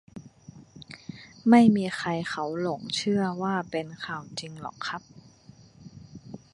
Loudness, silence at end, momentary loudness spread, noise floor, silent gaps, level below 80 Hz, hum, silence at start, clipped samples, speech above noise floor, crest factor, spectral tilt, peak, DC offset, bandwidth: -26 LUFS; 0.15 s; 26 LU; -53 dBFS; none; -66 dBFS; none; 0.15 s; under 0.1%; 28 dB; 22 dB; -5.5 dB/octave; -6 dBFS; under 0.1%; 11 kHz